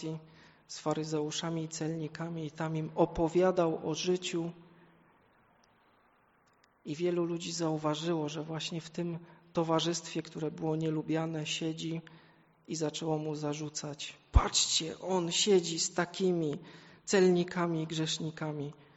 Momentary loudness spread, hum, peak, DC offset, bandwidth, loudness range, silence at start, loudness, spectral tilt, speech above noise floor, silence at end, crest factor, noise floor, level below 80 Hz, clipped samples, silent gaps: 12 LU; none; -10 dBFS; under 0.1%; 8.2 kHz; 7 LU; 0 s; -33 LUFS; -4.5 dB/octave; 36 dB; 0.15 s; 24 dB; -68 dBFS; -46 dBFS; under 0.1%; none